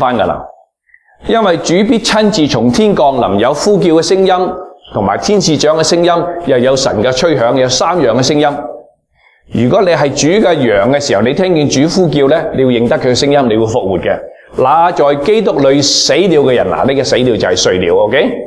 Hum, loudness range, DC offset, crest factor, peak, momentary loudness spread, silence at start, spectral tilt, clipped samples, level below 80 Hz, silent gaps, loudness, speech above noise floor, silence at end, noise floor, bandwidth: none; 2 LU; under 0.1%; 10 dB; 0 dBFS; 5 LU; 0 s; -4.5 dB/octave; under 0.1%; -40 dBFS; none; -10 LUFS; 41 dB; 0 s; -51 dBFS; 11 kHz